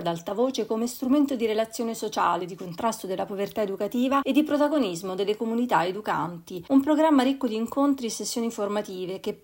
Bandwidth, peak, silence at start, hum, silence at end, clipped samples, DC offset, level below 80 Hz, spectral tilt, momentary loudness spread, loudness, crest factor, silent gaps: 16.5 kHz; -8 dBFS; 0 s; none; 0.05 s; under 0.1%; under 0.1%; -66 dBFS; -4.5 dB/octave; 8 LU; -26 LUFS; 16 dB; none